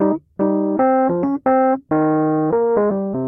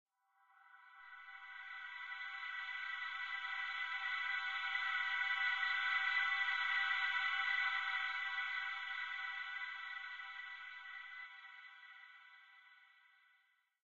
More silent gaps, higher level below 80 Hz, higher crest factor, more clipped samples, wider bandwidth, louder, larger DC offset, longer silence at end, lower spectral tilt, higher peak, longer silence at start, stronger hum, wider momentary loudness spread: neither; first, -56 dBFS vs -88 dBFS; second, 12 dB vs 18 dB; neither; second, 2.8 kHz vs 7.6 kHz; first, -17 LUFS vs -39 LUFS; neither; second, 0 s vs 0.85 s; first, -13 dB/octave vs 5 dB/octave; first, -6 dBFS vs -26 dBFS; second, 0 s vs 0.55 s; neither; second, 4 LU vs 19 LU